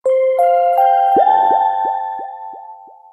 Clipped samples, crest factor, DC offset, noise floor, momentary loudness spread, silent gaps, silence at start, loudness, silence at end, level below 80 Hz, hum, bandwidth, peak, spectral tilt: under 0.1%; 12 dB; under 0.1%; -38 dBFS; 18 LU; none; 0.05 s; -14 LUFS; 0.3 s; -66 dBFS; none; 14 kHz; -2 dBFS; -5 dB/octave